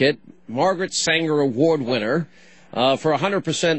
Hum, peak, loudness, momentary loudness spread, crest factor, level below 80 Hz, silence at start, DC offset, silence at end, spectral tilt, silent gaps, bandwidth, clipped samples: none; -6 dBFS; -20 LUFS; 11 LU; 16 dB; -64 dBFS; 0 s; 0.3%; 0 s; -4 dB/octave; none; 8.6 kHz; under 0.1%